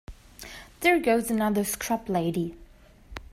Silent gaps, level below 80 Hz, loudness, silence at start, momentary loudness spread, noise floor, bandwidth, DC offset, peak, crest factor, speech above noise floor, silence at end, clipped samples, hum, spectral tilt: none; -50 dBFS; -26 LUFS; 0.1 s; 21 LU; -51 dBFS; 16 kHz; under 0.1%; -8 dBFS; 20 dB; 26 dB; 0.1 s; under 0.1%; none; -4.5 dB/octave